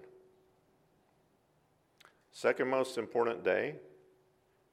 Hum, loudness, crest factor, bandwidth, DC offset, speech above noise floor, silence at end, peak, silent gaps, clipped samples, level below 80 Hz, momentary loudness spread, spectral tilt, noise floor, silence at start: none; -33 LUFS; 22 dB; 14.5 kHz; under 0.1%; 39 dB; 0.85 s; -16 dBFS; none; under 0.1%; -84 dBFS; 13 LU; -5 dB/octave; -72 dBFS; 0 s